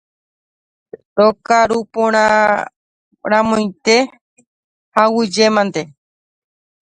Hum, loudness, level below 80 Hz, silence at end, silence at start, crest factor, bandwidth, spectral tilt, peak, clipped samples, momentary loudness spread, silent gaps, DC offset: none; -15 LUFS; -56 dBFS; 1 s; 1.15 s; 16 dB; 10.5 kHz; -4 dB/octave; 0 dBFS; under 0.1%; 12 LU; 2.76-3.11 s, 4.21-4.36 s, 4.47-4.92 s; under 0.1%